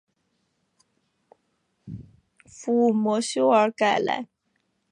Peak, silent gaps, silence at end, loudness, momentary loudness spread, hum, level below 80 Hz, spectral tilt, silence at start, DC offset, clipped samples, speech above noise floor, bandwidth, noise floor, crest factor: -8 dBFS; none; 0.65 s; -22 LUFS; 22 LU; none; -66 dBFS; -4.5 dB/octave; 1.85 s; under 0.1%; under 0.1%; 51 dB; 11 kHz; -73 dBFS; 18 dB